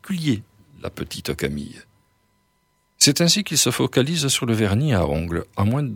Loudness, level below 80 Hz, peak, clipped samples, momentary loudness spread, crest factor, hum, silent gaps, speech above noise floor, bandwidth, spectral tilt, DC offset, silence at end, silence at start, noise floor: -20 LUFS; -44 dBFS; 0 dBFS; under 0.1%; 15 LU; 22 dB; none; none; 45 dB; 18.5 kHz; -4 dB/octave; under 0.1%; 0 s; 0.05 s; -66 dBFS